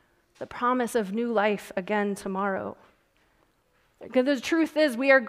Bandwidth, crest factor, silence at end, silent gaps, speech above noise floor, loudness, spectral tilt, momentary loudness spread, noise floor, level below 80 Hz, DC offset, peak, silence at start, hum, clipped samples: 15.5 kHz; 20 dB; 0 s; none; 42 dB; -26 LUFS; -5 dB/octave; 9 LU; -67 dBFS; -68 dBFS; under 0.1%; -6 dBFS; 0.4 s; none; under 0.1%